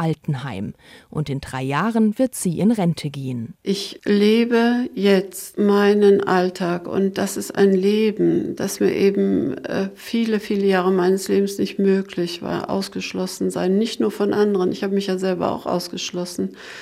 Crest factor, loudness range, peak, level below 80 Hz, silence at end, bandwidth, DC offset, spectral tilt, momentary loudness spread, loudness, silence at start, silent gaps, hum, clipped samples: 14 dB; 4 LU; -6 dBFS; -58 dBFS; 0 s; 15.5 kHz; under 0.1%; -6 dB/octave; 10 LU; -20 LUFS; 0 s; none; none; under 0.1%